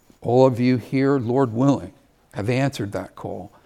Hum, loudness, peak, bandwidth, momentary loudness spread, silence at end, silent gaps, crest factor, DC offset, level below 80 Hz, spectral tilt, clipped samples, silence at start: none; -21 LUFS; -2 dBFS; 13.5 kHz; 16 LU; 0.2 s; none; 20 dB; under 0.1%; -60 dBFS; -7.5 dB/octave; under 0.1%; 0.2 s